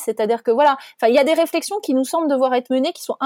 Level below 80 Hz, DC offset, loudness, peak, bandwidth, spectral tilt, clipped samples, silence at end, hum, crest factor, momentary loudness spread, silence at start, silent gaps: -76 dBFS; under 0.1%; -18 LUFS; -4 dBFS; 17 kHz; -3.5 dB/octave; under 0.1%; 0 s; none; 14 dB; 5 LU; 0 s; none